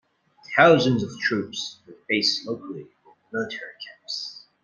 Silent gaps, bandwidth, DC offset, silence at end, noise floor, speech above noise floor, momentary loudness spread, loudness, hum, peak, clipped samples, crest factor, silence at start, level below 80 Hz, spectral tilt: none; 9.8 kHz; under 0.1%; 0.25 s; -50 dBFS; 26 dB; 21 LU; -23 LUFS; none; -2 dBFS; under 0.1%; 24 dB; 0.5 s; -64 dBFS; -4.5 dB/octave